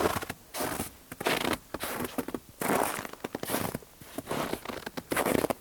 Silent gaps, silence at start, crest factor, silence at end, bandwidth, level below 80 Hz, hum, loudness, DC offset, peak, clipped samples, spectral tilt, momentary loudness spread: none; 0 s; 24 dB; 0 s; over 20 kHz; -56 dBFS; none; -33 LUFS; under 0.1%; -10 dBFS; under 0.1%; -3.5 dB/octave; 11 LU